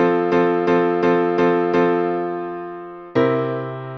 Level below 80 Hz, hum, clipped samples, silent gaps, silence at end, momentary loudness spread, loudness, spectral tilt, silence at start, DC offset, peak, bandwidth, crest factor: -60 dBFS; none; under 0.1%; none; 0 s; 11 LU; -19 LUFS; -8 dB/octave; 0 s; under 0.1%; -6 dBFS; 6.2 kHz; 14 dB